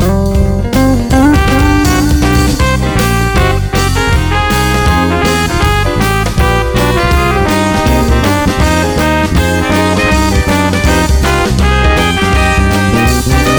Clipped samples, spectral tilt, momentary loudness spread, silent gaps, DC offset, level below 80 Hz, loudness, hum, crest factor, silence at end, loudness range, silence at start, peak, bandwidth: under 0.1%; -5 dB/octave; 2 LU; none; under 0.1%; -16 dBFS; -10 LUFS; none; 8 dB; 0 s; 1 LU; 0 s; 0 dBFS; over 20 kHz